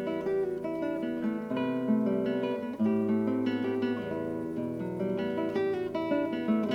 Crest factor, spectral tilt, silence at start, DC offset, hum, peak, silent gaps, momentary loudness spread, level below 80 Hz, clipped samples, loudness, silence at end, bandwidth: 14 dB; -8 dB/octave; 0 s; under 0.1%; none; -16 dBFS; none; 6 LU; -66 dBFS; under 0.1%; -31 LUFS; 0 s; 7 kHz